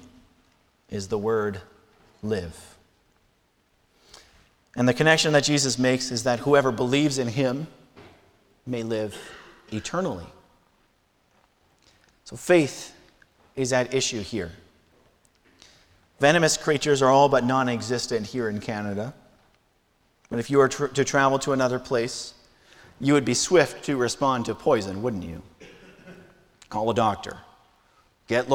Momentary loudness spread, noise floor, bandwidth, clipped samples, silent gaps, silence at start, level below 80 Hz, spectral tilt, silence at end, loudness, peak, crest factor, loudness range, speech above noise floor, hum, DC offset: 18 LU; -66 dBFS; 17.5 kHz; under 0.1%; none; 0.9 s; -56 dBFS; -4.5 dB/octave; 0 s; -24 LUFS; -4 dBFS; 22 dB; 11 LU; 43 dB; none; under 0.1%